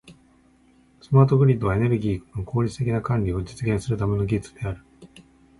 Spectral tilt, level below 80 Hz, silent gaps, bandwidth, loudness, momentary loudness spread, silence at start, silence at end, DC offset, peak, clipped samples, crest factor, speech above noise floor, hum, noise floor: -8.5 dB/octave; -42 dBFS; none; 11.5 kHz; -23 LUFS; 13 LU; 0.1 s; 0.55 s; under 0.1%; -6 dBFS; under 0.1%; 18 dB; 36 dB; none; -57 dBFS